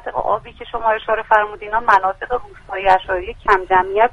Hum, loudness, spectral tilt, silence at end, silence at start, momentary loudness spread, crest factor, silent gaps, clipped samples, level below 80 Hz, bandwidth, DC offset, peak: none; -17 LUFS; -5 dB/octave; 0 s; 0.05 s; 10 LU; 18 dB; none; under 0.1%; -40 dBFS; 10.5 kHz; under 0.1%; 0 dBFS